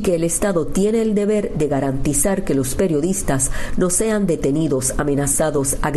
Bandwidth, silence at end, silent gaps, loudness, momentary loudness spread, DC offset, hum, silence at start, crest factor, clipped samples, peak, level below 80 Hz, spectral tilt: 12.5 kHz; 0 s; none; -19 LUFS; 3 LU; under 0.1%; none; 0 s; 12 dB; under 0.1%; -4 dBFS; -30 dBFS; -5 dB/octave